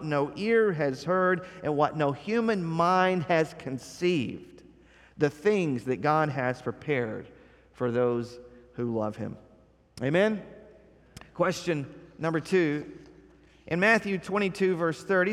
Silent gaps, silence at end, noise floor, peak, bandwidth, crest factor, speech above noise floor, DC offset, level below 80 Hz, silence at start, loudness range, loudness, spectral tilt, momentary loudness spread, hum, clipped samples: none; 0 s; -59 dBFS; -10 dBFS; 13 kHz; 18 dB; 32 dB; under 0.1%; -62 dBFS; 0 s; 5 LU; -28 LUFS; -6.5 dB/octave; 12 LU; none; under 0.1%